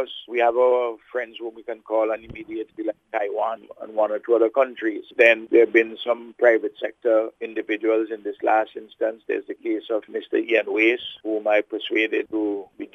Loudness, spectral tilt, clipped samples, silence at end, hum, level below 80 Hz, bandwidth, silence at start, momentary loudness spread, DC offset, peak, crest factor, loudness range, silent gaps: -22 LUFS; -5 dB/octave; under 0.1%; 0.1 s; none; -66 dBFS; 6.4 kHz; 0 s; 13 LU; under 0.1%; -2 dBFS; 20 dB; 6 LU; none